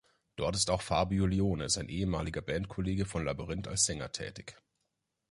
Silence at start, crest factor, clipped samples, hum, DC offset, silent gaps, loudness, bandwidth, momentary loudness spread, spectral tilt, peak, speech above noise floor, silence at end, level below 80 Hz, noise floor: 0.4 s; 20 dB; under 0.1%; none; under 0.1%; none; -33 LUFS; 11.5 kHz; 10 LU; -4 dB/octave; -14 dBFS; 50 dB; 0.75 s; -48 dBFS; -83 dBFS